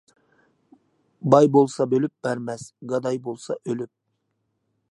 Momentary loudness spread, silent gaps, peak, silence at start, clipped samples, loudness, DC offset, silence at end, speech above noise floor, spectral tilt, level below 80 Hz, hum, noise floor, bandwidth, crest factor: 15 LU; none; -2 dBFS; 1.25 s; under 0.1%; -22 LUFS; under 0.1%; 1.1 s; 53 dB; -7 dB/octave; -72 dBFS; none; -75 dBFS; 11.5 kHz; 24 dB